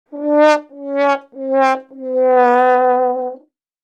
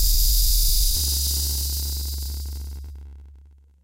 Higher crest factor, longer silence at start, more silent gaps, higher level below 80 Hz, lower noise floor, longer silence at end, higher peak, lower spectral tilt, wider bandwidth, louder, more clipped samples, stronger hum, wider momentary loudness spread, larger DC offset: about the same, 14 dB vs 14 dB; about the same, 0.1 s vs 0 s; neither; second, -90 dBFS vs -24 dBFS; second, -42 dBFS vs -49 dBFS; about the same, 0.45 s vs 0.4 s; first, 0 dBFS vs -8 dBFS; first, -3 dB/octave vs -1.5 dB/octave; second, 9 kHz vs 16 kHz; first, -15 LUFS vs -22 LUFS; neither; neither; second, 11 LU vs 18 LU; neither